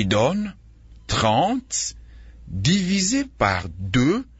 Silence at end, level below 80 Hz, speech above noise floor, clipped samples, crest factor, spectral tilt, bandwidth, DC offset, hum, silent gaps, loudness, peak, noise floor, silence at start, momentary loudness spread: 0.15 s; -42 dBFS; 25 dB; under 0.1%; 18 dB; -4.5 dB/octave; 8 kHz; under 0.1%; none; none; -22 LUFS; -4 dBFS; -47 dBFS; 0 s; 8 LU